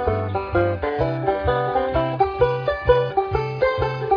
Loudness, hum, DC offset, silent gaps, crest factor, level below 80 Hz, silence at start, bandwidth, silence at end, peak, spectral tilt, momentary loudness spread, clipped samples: -21 LUFS; none; under 0.1%; none; 18 dB; -36 dBFS; 0 s; 5.4 kHz; 0 s; -2 dBFS; -8.5 dB/octave; 4 LU; under 0.1%